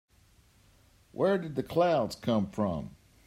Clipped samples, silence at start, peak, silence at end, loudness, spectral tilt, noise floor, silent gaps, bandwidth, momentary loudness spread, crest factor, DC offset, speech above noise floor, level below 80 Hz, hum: under 0.1%; 1.15 s; -14 dBFS; 0.35 s; -30 LUFS; -7 dB/octave; -63 dBFS; none; 16 kHz; 12 LU; 16 dB; under 0.1%; 34 dB; -60 dBFS; none